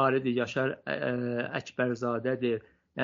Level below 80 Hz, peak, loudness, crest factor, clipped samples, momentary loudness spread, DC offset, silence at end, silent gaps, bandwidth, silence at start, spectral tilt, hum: -70 dBFS; -12 dBFS; -31 LUFS; 18 dB; under 0.1%; 5 LU; under 0.1%; 0 s; none; 7.4 kHz; 0 s; -5 dB/octave; none